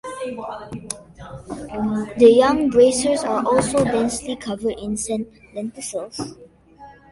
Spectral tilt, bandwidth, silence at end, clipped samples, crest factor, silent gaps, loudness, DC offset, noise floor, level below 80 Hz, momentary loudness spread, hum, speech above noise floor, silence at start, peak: -4.5 dB/octave; 11.5 kHz; 0.2 s; under 0.1%; 20 dB; none; -19 LUFS; under 0.1%; -45 dBFS; -48 dBFS; 19 LU; none; 25 dB; 0.05 s; 0 dBFS